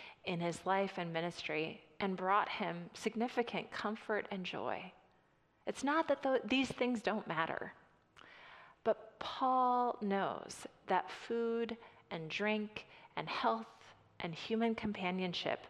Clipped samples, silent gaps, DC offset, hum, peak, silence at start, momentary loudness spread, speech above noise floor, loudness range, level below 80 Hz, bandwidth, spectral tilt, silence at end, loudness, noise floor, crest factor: under 0.1%; none; under 0.1%; none; -18 dBFS; 0 s; 13 LU; 35 dB; 3 LU; -74 dBFS; 12.5 kHz; -5 dB/octave; 0 s; -38 LUFS; -72 dBFS; 20 dB